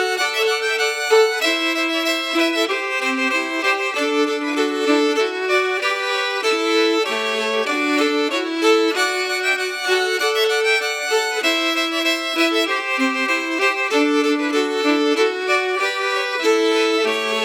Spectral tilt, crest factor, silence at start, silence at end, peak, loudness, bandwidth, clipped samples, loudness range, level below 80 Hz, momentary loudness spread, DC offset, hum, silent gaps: -0.5 dB/octave; 14 dB; 0 s; 0 s; -4 dBFS; -18 LUFS; 19 kHz; under 0.1%; 1 LU; -88 dBFS; 3 LU; under 0.1%; none; none